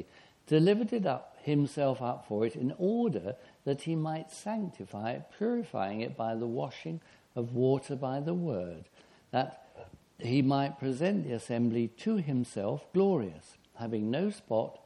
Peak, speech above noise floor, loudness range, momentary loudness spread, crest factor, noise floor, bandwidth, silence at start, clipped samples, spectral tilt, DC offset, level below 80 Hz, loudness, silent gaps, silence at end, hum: -14 dBFS; 21 dB; 5 LU; 13 LU; 18 dB; -53 dBFS; 11.5 kHz; 0 s; under 0.1%; -7.5 dB/octave; under 0.1%; -72 dBFS; -32 LUFS; none; 0.1 s; none